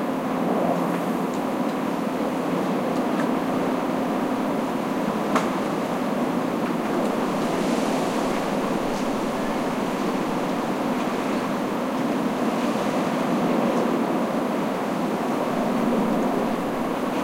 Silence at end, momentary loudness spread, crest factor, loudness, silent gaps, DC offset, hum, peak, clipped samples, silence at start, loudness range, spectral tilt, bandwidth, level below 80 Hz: 0 s; 3 LU; 18 dB; -24 LUFS; none; under 0.1%; none; -6 dBFS; under 0.1%; 0 s; 1 LU; -6 dB/octave; 16 kHz; -54 dBFS